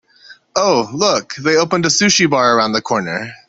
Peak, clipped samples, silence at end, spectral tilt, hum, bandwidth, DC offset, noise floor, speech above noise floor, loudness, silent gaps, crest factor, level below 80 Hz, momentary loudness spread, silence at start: 0 dBFS; under 0.1%; 0.15 s; -3 dB/octave; none; 8.4 kHz; under 0.1%; -44 dBFS; 29 dB; -14 LUFS; none; 16 dB; -56 dBFS; 7 LU; 0.3 s